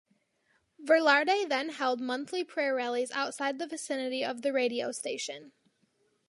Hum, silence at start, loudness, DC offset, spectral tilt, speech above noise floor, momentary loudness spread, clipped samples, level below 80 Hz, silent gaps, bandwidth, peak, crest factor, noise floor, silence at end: none; 0.8 s; -30 LUFS; under 0.1%; -2 dB/octave; 43 dB; 11 LU; under 0.1%; -88 dBFS; none; 11.5 kHz; -10 dBFS; 22 dB; -73 dBFS; 0.8 s